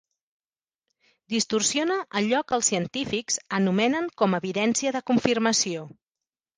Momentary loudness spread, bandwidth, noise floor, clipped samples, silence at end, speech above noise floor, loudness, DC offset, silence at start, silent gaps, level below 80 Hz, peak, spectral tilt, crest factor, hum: 6 LU; 10.5 kHz; under -90 dBFS; under 0.1%; 0.7 s; over 65 dB; -24 LUFS; under 0.1%; 1.3 s; none; -64 dBFS; -4 dBFS; -3.5 dB/octave; 22 dB; none